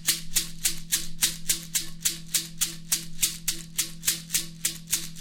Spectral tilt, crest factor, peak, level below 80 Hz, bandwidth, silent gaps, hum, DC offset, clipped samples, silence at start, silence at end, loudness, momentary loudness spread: 0 dB/octave; 20 dB; -8 dBFS; -42 dBFS; over 20 kHz; none; none; under 0.1%; under 0.1%; 0 s; 0 s; -27 LUFS; 5 LU